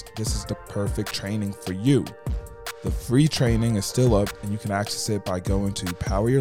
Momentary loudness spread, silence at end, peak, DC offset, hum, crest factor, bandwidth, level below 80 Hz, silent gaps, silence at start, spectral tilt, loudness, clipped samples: 11 LU; 0 s; -8 dBFS; under 0.1%; none; 16 dB; 17 kHz; -36 dBFS; none; 0 s; -5.5 dB/octave; -25 LUFS; under 0.1%